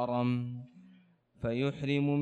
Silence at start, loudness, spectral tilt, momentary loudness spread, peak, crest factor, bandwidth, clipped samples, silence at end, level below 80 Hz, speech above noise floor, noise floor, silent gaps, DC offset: 0 s; -33 LUFS; -8.5 dB/octave; 14 LU; -20 dBFS; 14 dB; 8.2 kHz; under 0.1%; 0 s; -62 dBFS; 32 dB; -63 dBFS; none; under 0.1%